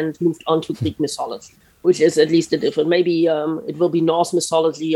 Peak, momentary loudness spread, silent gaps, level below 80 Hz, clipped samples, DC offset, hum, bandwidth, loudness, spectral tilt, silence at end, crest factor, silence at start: -2 dBFS; 8 LU; none; -60 dBFS; under 0.1%; under 0.1%; none; 12.5 kHz; -19 LUFS; -5.5 dB/octave; 0 s; 16 dB; 0 s